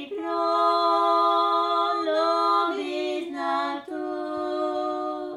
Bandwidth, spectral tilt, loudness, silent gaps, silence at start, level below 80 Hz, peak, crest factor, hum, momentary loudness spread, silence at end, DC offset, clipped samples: 12 kHz; -3.5 dB/octave; -24 LUFS; none; 0 s; -74 dBFS; -10 dBFS; 14 dB; none; 9 LU; 0 s; under 0.1%; under 0.1%